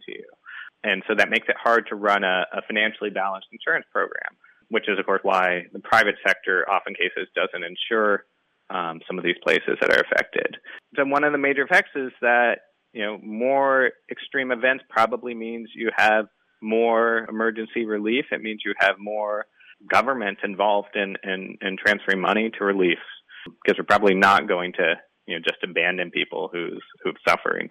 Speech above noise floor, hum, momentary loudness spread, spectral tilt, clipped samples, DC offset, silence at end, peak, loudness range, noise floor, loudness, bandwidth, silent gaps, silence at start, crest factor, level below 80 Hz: 19 dB; none; 12 LU; -4.5 dB/octave; under 0.1%; under 0.1%; 0 s; -6 dBFS; 3 LU; -42 dBFS; -22 LUFS; 15.5 kHz; none; 0.1 s; 18 dB; -66 dBFS